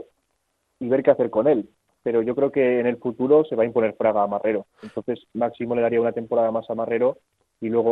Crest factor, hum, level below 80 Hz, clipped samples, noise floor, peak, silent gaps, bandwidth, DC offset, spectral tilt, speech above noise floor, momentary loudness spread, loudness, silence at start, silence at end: 18 dB; none; -66 dBFS; under 0.1%; -73 dBFS; -4 dBFS; none; 4 kHz; under 0.1%; -9.5 dB/octave; 51 dB; 11 LU; -22 LUFS; 0.8 s; 0 s